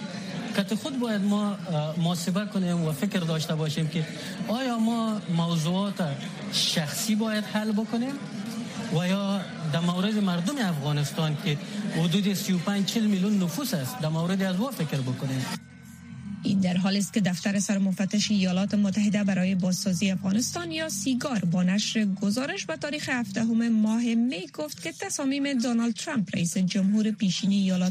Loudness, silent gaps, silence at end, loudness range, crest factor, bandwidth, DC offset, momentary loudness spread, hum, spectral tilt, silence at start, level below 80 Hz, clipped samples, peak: -27 LUFS; none; 0 s; 3 LU; 14 dB; 15.5 kHz; under 0.1%; 7 LU; none; -5 dB/octave; 0 s; -68 dBFS; under 0.1%; -12 dBFS